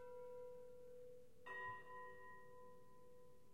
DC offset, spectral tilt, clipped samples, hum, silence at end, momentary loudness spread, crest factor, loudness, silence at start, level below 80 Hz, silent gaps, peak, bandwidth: under 0.1%; -5 dB/octave; under 0.1%; none; 0 s; 16 LU; 16 dB; -57 LUFS; 0 s; -84 dBFS; none; -40 dBFS; 15.5 kHz